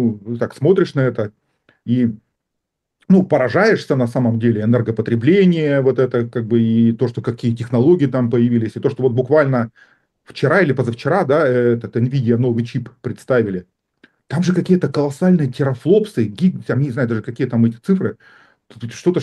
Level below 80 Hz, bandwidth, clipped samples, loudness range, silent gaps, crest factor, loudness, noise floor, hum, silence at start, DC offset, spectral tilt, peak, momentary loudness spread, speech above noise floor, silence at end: -60 dBFS; 11 kHz; under 0.1%; 3 LU; none; 14 dB; -17 LUFS; -78 dBFS; none; 0 s; under 0.1%; -8.5 dB/octave; -2 dBFS; 9 LU; 62 dB; 0 s